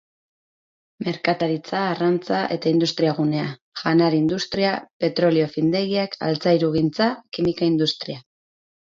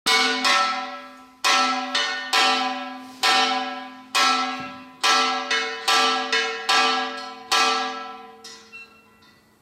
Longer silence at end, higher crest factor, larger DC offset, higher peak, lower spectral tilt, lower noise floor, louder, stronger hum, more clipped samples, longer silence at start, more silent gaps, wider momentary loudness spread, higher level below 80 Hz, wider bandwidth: about the same, 0.65 s vs 0.75 s; about the same, 16 dB vs 16 dB; neither; about the same, -4 dBFS vs -6 dBFS; first, -6.5 dB/octave vs 0.5 dB/octave; first, under -90 dBFS vs -55 dBFS; about the same, -22 LUFS vs -20 LUFS; neither; neither; first, 1 s vs 0.05 s; first, 3.62-3.72 s, 4.93-5.00 s vs none; second, 7 LU vs 18 LU; first, -58 dBFS vs -72 dBFS; second, 7.6 kHz vs 16 kHz